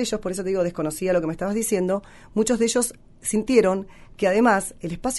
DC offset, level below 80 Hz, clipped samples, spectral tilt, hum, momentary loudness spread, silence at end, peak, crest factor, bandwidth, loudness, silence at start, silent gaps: under 0.1%; -48 dBFS; under 0.1%; -4.5 dB/octave; none; 10 LU; 0 s; -4 dBFS; 18 dB; 12 kHz; -23 LUFS; 0 s; none